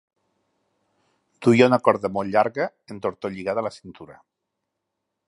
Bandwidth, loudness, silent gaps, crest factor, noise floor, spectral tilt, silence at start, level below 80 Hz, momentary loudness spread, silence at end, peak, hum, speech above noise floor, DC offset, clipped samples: 11.5 kHz; -22 LUFS; none; 24 dB; -81 dBFS; -6.5 dB/octave; 1.4 s; -64 dBFS; 15 LU; 1.15 s; -2 dBFS; none; 59 dB; under 0.1%; under 0.1%